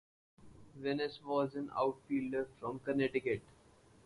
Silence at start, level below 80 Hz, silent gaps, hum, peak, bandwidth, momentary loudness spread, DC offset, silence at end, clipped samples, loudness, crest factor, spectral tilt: 0.4 s; -70 dBFS; none; none; -20 dBFS; 11 kHz; 7 LU; under 0.1%; 0.65 s; under 0.1%; -38 LUFS; 18 dB; -7 dB/octave